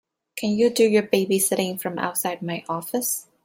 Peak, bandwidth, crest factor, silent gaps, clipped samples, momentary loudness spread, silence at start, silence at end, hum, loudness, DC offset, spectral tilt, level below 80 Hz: -4 dBFS; 16.5 kHz; 20 dB; none; under 0.1%; 10 LU; 0.35 s; 0.2 s; none; -23 LUFS; under 0.1%; -4 dB/octave; -68 dBFS